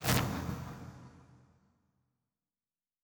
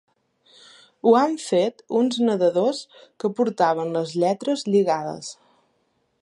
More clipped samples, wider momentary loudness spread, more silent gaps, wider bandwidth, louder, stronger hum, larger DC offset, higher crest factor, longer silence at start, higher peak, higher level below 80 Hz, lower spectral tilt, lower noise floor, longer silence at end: neither; first, 23 LU vs 10 LU; neither; first, over 20 kHz vs 11.5 kHz; second, -36 LUFS vs -22 LUFS; neither; neither; first, 30 dB vs 18 dB; second, 0 s vs 1.05 s; second, -10 dBFS vs -6 dBFS; first, -54 dBFS vs -76 dBFS; about the same, -4.5 dB/octave vs -5.5 dB/octave; first, under -90 dBFS vs -69 dBFS; first, 1.7 s vs 0.9 s